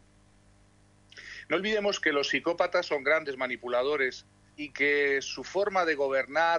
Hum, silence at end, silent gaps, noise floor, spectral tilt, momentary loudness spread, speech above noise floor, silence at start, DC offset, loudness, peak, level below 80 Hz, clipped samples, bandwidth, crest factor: 50 Hz at -60 dBFS; 0 s; none; -61 dBFS; -3 dB/octave; 13 LU; 33 dB; 1.15 s; under 0.1%; -28 LUFS; -12 dBFS; -66 dBFS; under 0.1%; 10.5 kHz; 16 dB